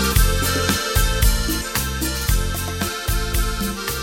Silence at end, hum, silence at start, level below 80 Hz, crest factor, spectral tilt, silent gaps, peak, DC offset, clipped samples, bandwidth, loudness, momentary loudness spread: 0 s; none; 0 s; -22 dBFS; 16 dB; -3.5 dB/octave; none; -2 dBFS; under 0.1%; under 0.1%; 17 kHz; -21 LUFS; 6 LU